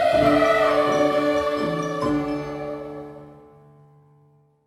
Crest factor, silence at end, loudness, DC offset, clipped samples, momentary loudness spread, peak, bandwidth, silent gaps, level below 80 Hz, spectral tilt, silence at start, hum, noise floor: 16 dB; 1.35 s; -21 LUFS; under 0.1%; under 0.1%; 16 LU; -6 dBFS; 14.5 kHz; none; -50 dBFS; -5.5 dB/octave; 0 s; none; -58 dBFS